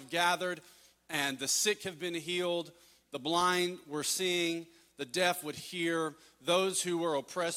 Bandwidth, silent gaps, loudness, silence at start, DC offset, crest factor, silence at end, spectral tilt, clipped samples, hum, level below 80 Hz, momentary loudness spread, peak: 17 kHz; none; -32 LUFS; 0 s; under 0.1%; 20 dB; 0 s; -2.5 dB/octave; under 0.1%; none; -78 dBFS; 11 LU; -14 dBFS